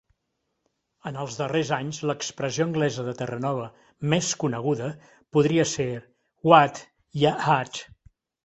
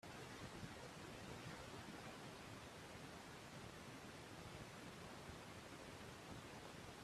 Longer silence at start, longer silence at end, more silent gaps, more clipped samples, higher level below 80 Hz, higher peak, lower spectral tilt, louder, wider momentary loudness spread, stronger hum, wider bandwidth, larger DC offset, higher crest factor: first, 1.05 s vs 0.05 s; first, 0.6 s vs 0 s; neither; neither; first, -62 dBFS vs -72 dBFS; first, -2 dBFS vs -38 dBFS; about the same, -5 dB/octave vs -4 dB/octave; first, -25 LUFS vs -56 LUFS; first, 17 LU vs 2 LU; neither; second, 8.2 kHz vs 15 kHz; neither; first, 24 dB vs 18 dB